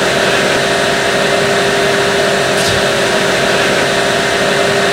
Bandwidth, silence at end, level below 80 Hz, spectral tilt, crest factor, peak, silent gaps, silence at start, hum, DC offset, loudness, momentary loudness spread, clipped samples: 16 kHz; 0 s; -40 dBFS; -3 dB/octave; 12 dB; 0 dBFS; none; 0 s; none; under 0.1%; -11 LUFS; 1 LU; under 0.1%